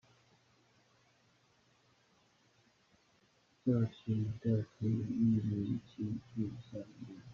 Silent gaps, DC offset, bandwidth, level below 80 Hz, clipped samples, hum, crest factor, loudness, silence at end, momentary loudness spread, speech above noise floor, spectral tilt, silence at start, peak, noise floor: none; under 0.1%; 7 kHz; -68 dBFS; under 0.1%; none; 18 dB; -37 LUFS; 0 s; 16 LU; 36 dB; -9.5 dB/octave; 3.65 s; -20 dBFS; -72 dBFS